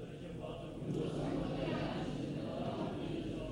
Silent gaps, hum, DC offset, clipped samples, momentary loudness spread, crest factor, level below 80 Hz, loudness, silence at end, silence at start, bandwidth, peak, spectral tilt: none; none; under 0.1%; under 0.1%; 7 LU; 14 dB; -56 dBFS; -40 LUFS; 0 s; 0 s; 16 kHz; -26 dBFS; -7.5 dB/octave